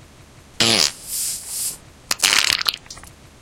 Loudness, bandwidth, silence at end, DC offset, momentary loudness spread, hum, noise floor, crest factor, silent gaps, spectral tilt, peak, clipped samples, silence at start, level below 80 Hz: -18 LUFS; over 20 kHz; 0.35 s; under 0.1%; 20 LU; none; -46 dBFS; 22 dB; none; 0 dB/octave; 0 dBFS; under 0.1%; 0.6 s; -50 dBFS